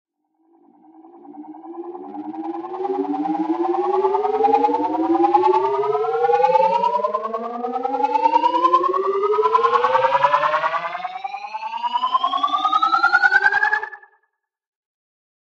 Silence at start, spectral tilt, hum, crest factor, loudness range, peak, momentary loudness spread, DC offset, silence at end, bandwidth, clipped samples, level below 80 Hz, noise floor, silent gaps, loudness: 1.05 s; -4.5 dB/octave; none; 18 dB; 6 LU; -2 dBFS; 14 LU; under 0.1%; 1.45 s; 8 kHz; under 0.1%; -78 dBFS; -72 dBFS; none; -19 LUFS